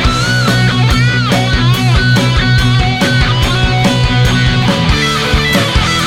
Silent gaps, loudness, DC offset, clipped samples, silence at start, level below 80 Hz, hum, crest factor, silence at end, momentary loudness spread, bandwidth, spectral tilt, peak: none; -11 LUFS; under 0.1%; under 0.1%; 0 s; -20 dBFS; none; 10 dB; 0 s; 1 LU; 16 kHz; -5 dB/octave; 0 dBFS